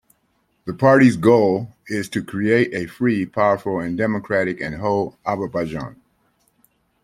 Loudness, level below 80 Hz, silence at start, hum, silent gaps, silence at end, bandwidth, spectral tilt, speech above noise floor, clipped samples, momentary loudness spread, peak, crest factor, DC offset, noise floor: -19 LUFS; -54 dBFS; 0.65 s; none; none; 1.1 s; 14.5 kHz; -7 dB/octave; 47 dB; under 0.1%; 14 LU; -2 dBFS; 18 dB; under 0.1%; -66 dBFS